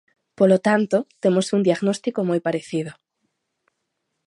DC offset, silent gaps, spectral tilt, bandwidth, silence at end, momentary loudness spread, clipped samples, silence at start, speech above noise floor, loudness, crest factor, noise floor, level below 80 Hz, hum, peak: under 0.1%; none; -6 dB/octave; 11.5 kHz; 1.35 s; 9 LU; under 0.1%; 0.4 s; 57 dB; -21 LUFS; 18 dB; -77 dBFS; -70 dBFS; none; -4 dBFS